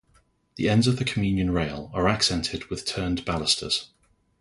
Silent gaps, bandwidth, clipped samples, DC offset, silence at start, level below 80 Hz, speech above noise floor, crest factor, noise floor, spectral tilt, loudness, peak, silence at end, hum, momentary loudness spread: none; 11.5 kHz; under 0.1%; under 0.1%; 0.55 s; -44 dBFS; 39 dB; 20 dB; -63 dBFS; -4.5 dB/octave; -25 LUFS; -6 dBFS; 0.55 s; none; 8 LU